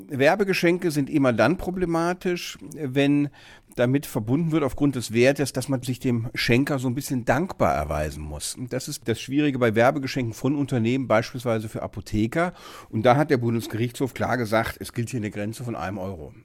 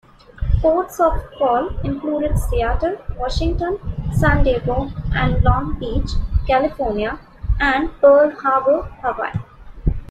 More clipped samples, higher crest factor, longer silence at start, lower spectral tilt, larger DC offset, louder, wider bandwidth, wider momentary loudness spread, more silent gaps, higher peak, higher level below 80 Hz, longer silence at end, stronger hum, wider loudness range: neither; about the same, 18 dB vs 16 dB; second, 0 s vs 0.35 s; about the same, -6 dB/octave vs -7 dB/octave; neither; second, -24 LUFS vs -19 LUFS; first, 17.5 kHz vs 14.5 kHz; about the same, 10 LU vs 10 LU; neither; second, -6 dBFS vs -2 dBFS; second, -46 dBFS vs -24 dBFS; about the same, 0.05 s vs 0 s; neither; about the same, 2 LU vs 3 LU